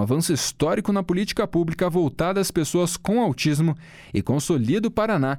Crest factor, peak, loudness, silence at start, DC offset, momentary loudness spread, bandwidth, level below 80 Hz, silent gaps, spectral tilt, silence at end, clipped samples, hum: 12 dB; -10 dBFS; -23 LUFS; 0 s; under 0.1%; 3 LU; 17.5 kHz; -48 dBFS; none; -5.5 dB/octave; 0 s; under 0.1%; none